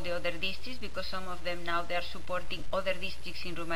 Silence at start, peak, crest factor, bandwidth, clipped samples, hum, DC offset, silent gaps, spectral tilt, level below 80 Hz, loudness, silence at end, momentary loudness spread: 0 s; -16 dBFS; 18 dB; 16 kHz; under 0.1%; none; 4%; none; -4 dB/octave; -50 dBFS; -36 LUFS; 0 s; 7 LU